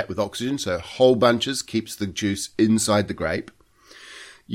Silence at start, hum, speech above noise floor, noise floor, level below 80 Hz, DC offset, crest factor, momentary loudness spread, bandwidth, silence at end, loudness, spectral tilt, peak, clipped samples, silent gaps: 0 s; none; 27 dB; -49 dBFS; -52 dBFS; under 0.1%; 18 dB; 15 LU; 16.5 kHz; 0 s; -22 LUFS; -4.5 dB/octave; -4 dBFS; under 0.1%; none